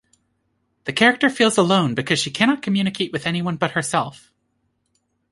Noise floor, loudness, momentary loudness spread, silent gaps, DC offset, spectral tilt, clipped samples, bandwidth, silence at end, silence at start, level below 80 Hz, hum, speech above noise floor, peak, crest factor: -70 dBFS; -19 LUFS; 8 LU; none; under 0.1%; -4.5 dB/octave; under 0.1%; 11.5 kHz; 1.2 s; 0.85 s; -60 dBFS; none; 50 dB; -2 dBFS; 20 dB